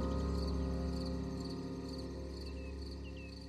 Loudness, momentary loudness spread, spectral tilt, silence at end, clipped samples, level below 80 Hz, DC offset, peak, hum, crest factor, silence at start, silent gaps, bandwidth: -41 LUFS; 8 LU; -7 dB/octave; 0 s; under 0.1%; -44 dBFS; under 0.1%; -26 dBFS; none; 14 dB; 0 s; none; 12 kHz